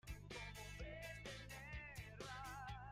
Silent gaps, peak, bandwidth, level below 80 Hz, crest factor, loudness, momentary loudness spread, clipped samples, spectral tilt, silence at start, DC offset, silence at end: none; -40 dBFS; 16 kHz; -60 dBFS; 12 dB; -53 LUFS; 2 LU; under 0.1%; -4 dB/octave; 0.05 s; under 0.1%; 0 s